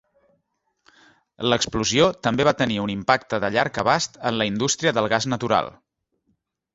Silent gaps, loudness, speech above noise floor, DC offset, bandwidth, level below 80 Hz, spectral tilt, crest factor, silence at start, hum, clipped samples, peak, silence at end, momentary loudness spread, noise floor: none; -21 LUFS; 52 dB; under 0.1%; 8 kHz; -52 dBFS; -4 dB/octave; 22 dB; 1.4 s; none; under 0.1%; -2 dBFS; 1.05 s; 4 LU; -73 dBFS